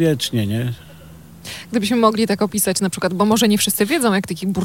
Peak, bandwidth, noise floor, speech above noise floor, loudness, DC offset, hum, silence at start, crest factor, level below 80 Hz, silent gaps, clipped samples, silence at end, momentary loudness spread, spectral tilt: 0 dBFS; 17 kHz; -41 dBFS; 23 dB; -18 LUFS; under 0.1%; none; 0 s; 18 dB; -52 dBFS; none; under 0.1%; 0 s; 12 LU; -4.5 dB/octave